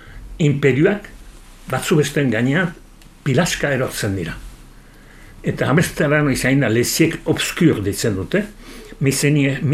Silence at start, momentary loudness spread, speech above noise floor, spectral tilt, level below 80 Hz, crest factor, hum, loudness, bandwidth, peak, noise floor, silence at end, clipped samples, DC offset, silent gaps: 0 s; 10 LU; 25 dB; -5.5 dB/octave; -40 dBFS; 16 dB; none; -18 LUFS; 15.5 kHz; -2 dBFS; -43 dBFS; 0 s; under 0.1%; under 0.1%; none